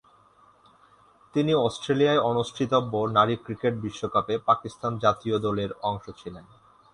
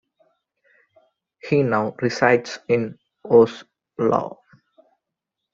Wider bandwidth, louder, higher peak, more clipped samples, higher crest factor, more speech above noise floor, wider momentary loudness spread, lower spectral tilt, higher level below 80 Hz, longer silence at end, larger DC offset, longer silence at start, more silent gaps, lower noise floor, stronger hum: first, 11 kHz vs 7.6 kHz; second, -25 LUFS vs -20 LUFS; second, -8 dBFS vs -2 dBFS; neither; about the same, 20 dB vs 22 dB; second, 33 dB vs 64 dB; second, 10 LU vs 23 LU; about the same, -6 dB/octave vs -6.5 dB/octave; first, -58 dBFS vs -64 dBFS; second, 0.5 s vs 1.25 s; neither; about the same, 1.35 s vs 1.45 s; neither; second, -58 dBFS vs -83 dBFS; neither